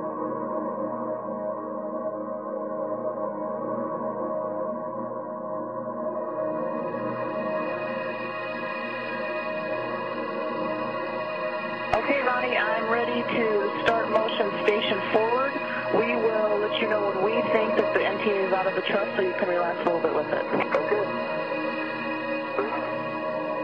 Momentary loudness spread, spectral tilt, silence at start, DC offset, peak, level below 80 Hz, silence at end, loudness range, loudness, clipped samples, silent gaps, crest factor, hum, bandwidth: 8 LU; -6.5 dB/octave; 0 s; 0.1%; -8 dBFS; -66 dBFS; 0 s; 7 LU; -27 LUFS; under 0.1%; none; 20 dB; none; 7.8 kHz